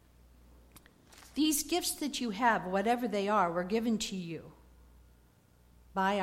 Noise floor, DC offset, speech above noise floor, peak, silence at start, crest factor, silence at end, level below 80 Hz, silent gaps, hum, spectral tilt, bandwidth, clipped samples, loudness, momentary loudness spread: -63 dBFS; under 0.1%; 32 dB; -14 dBFS; 0.75 s; 20 dB; 0 s; -60 dBFS; none; 60 Hz at -60 dBFS; -3.5 dB/octave; 16.5 kHz; under 0.1%; -32 LUFS; 11 LU